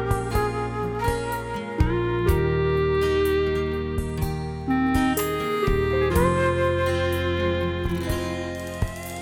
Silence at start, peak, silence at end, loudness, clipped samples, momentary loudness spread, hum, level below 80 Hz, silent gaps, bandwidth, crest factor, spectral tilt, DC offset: 0 s; -8 dBFS; 0 s; -24 LUFS; under 0.1%; 8 LU; none; -32 dBFS; none; 17.5 kHz; 14 dB; -6.5 dB/octave; under 0.1%